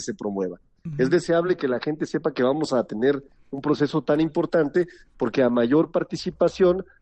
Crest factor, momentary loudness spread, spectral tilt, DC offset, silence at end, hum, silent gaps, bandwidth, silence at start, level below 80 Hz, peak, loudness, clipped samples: 14 dB; 10 LU; -6.5 dB/octave; under 0.1%; 0.2 s; none; none; 8.8 kHz; 0 s; -56 dBFS; -8 dBFS; -23 LUFS; under 0.1%